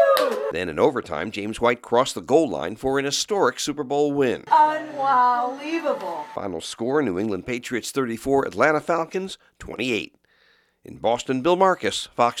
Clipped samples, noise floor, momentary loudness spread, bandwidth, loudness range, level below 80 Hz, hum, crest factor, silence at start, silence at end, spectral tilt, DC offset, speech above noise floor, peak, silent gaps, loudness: under 0.1%; -61 dBFS; 10 LU; 16.5 kHz; 4 LU; -56 dBFS; none; 20 dB; 0 s; 0 s; -4 dB/octave; under 0.1%; 38 dB; -2 dBFS; none; -23 LUFS